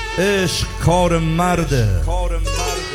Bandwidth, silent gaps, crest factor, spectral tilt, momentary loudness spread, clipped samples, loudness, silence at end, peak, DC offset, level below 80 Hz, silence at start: 16.5 kHz; none; 14 dB; -5 dB/octave; 6 LU; under 0.1%; -18 LUFS; 0 s; -4 dBFS; under 0.1%; -24 dBFS; 0 s